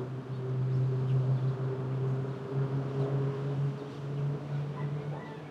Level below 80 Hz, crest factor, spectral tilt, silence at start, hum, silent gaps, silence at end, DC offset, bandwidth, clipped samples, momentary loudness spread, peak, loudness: -68 dBFS; 12 dB; -9.5 dB/octave; 0 s; none; none; 0 s; under 0.1%; 5.8 kHz; under 0.1%; 8 LU; -20 dBFS; -33 LUFS